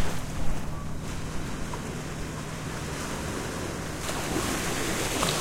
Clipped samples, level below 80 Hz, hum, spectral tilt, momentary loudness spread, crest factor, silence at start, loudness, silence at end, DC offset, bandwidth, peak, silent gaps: under 0.1%; -38 dBFS; none; -4 dB/octave; 7 LU; 20 dB; 0 s; -32 LUFS; 0 s; under 0.1%; 16 kHz; -8 dBFS; none